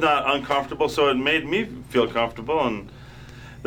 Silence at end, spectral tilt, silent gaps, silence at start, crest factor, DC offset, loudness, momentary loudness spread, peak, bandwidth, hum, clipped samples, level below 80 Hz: 0 s; -5 dB/octave; none; 0 s; 18 dB; under 0.1%; -23 LUFS; 22 LU; -6 dBFS; over 20 kHz; none; under 0.1%; -48 dBFS